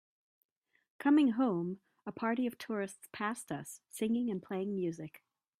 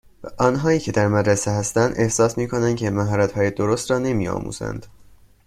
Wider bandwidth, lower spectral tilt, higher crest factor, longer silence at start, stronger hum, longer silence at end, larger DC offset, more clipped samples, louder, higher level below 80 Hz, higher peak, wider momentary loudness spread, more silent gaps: about the same, 14.5 kHz vs 14 kHz; about the same, -6 dB/octave vs -5.5 dB/octave; about the same, 18 dB vs 18 dB; first, 1 s vs 0.2 s; neither; about the same, 0.45 s vs 0.45 s; neither; neither; second, -35 LUFS vs -21 LUFS; second, -80 dBFS vs -46 dBFS; second, -18 dBFS vs -2 dBFS; first, 17 LU vs 9 LU; neither